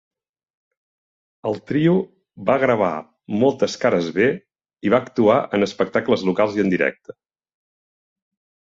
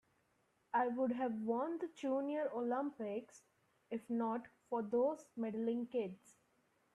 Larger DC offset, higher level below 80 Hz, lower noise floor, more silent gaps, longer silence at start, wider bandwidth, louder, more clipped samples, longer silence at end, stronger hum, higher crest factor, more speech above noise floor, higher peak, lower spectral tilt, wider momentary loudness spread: neither; first, -60 dBFS vs -86 dBFS; first, under -90 dBFS vs -78 dBFS; neither; first, 1.45 s vs 0.75 s; second, 7.8 kHz vs 11.5 kHz; first, -20 LUFS vs -40 LUFS; neither; first, 1.8 s vs 0.8 s; neither; about the same, 18 dB vs 18 dB; first, over 71 dB vs 39 dB; first, -2 dBFS vs -24 dBFS; about the same, -6.5 dB/octave vs -6.5 dB/octave; about the same, 10 LU vs 9 LU